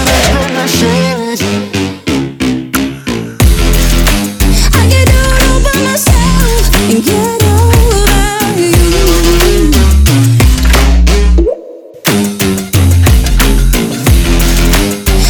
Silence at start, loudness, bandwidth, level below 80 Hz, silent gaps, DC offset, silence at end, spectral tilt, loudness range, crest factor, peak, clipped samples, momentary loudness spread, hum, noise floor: 0 s; -9 LUFS; over 20 kHz; -10 dBFS; none; under 0.1%; 0 s; -4.5 dB/octave; 4 LU; 8 dB; 0 dBFS; 0.1%; 7 LU; none; -28 dBFS